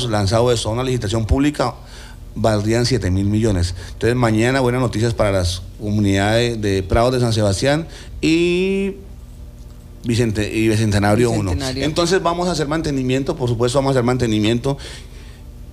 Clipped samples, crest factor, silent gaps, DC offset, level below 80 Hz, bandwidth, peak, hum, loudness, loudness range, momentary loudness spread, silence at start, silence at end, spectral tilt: under 0.1%; 14 dB; none; under 0.1%; -34 dBFS; 14.5 kHz; -4 dBFS; none; -18 LUFS; 2 LU; 12 LU; 0 s; 0 s; -6 dB/octave